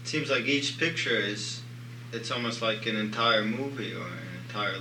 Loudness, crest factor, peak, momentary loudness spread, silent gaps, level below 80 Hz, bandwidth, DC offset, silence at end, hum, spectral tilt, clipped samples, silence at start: -29 LUFS; 20 dB; -10 dBFS; 14 LU; none; -78 dBFS; 18 kHz; under 0.1%; 0 s; 60 Hz at -45 dBFS; -4 dB/octave; under 0.1%; 0 s